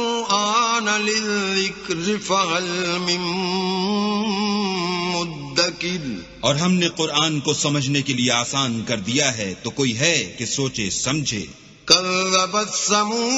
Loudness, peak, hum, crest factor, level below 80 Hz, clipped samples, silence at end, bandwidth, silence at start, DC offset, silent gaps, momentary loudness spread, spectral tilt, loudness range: -20 LUFS; 0 dBFS; none; 22 dB; -54 dBFS; under 0.1%; 0 s; 8.2 kHz; 0 s; under 0.1%; none; 6 LU; -3 dB/octave; 2 LU